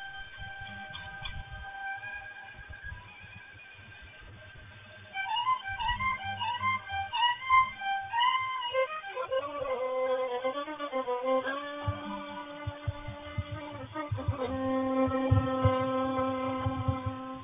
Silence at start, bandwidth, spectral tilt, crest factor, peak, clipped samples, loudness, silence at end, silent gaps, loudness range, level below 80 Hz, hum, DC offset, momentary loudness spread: 0 s; 3.9 kHz; -3.5 dB/octave; 20 dB; -12 dBFS; under 0.1%; -32 LUFS; 0 s; none; 13 LU; -48 dBFS; none; under 0.1%; 19 LU